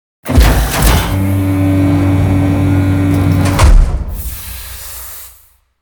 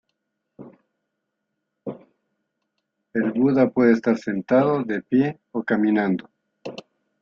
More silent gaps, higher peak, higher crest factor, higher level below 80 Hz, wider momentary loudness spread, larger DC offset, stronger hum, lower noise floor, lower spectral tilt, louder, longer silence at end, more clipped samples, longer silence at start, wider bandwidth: neither; first, 0 dBFS vs -4 dBFS; second, 12 dB vs 20 dB; first, -16 dBFS vs -66 dBFS; second, 14 LU vs 19 LU; neither; neither; second, -46 dBFS vs -79 dBFS; second, -6 dB/octave vs -8.5 dB/octave; first, -12 LUFS vs -21 LUFS; first, 0.55 s vs 0.4 s; first, 0.1% vs under 0.1%; second, 0.25 s vs 0.6 s; first, over 20 kHz vs 7 kHz